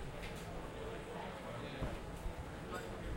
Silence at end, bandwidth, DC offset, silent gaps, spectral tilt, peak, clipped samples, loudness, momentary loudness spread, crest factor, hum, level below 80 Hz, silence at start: 0 s; 16.5 kHz; under 0.1%; none; -5.5 dB/octave; -30 dBFS; under 0.1%; -46 LUFS; 3 LU; 16 dB; none; -50 dBFS; 0 s